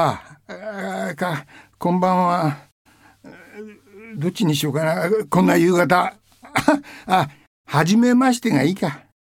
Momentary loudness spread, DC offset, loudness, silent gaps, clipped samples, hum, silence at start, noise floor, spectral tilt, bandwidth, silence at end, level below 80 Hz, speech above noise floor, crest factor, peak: 19 LU; under 0.1%; -19 LUFS; 2.72-2.85 s, 7.47-7.64 s; under 0.1%; none; 0 s; -46 dBFS; -6 dB/octave; 17.5 kHz; 0.35 s; -58 dBFS; 27 dB; 18 dB; -2 dBFS